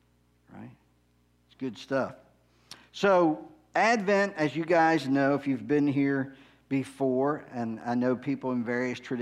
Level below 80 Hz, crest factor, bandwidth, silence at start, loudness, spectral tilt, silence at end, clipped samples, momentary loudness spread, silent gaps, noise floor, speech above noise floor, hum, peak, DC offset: -70 dBFS; 18 dB; 11 kHz; 0.55 s; -28 LUFS; -6.5 dB/octave; 0 s; under 0.1%; 15 LU; none; -67 dBFS; 40 dB; 60 Hz at -60 dBFS; -10 dBFS; under 0.1%